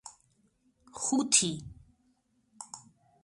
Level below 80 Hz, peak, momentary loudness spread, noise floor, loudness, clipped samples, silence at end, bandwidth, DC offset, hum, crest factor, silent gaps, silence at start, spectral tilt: -64 dBFS; -10 dBFS; 26 LU; -72 dBFS; -27 LUFS; under 0.1%; 0.45 s; 11.5 kHz; under 0.1%; none; 26 dB; none; 0.05 s; -2 dB/octave